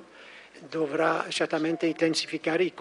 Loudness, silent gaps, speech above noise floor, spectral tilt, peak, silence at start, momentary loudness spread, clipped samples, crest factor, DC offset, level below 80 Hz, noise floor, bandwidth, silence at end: -27 LUFS; none; 23 dB; -4 dB/octave; -10 dBFS; 0 s; 21 LU; under 0.1%; 18 dB; under 0.1%; -78 dBFS; -49 dBFS; 11.5 kHz; 0 s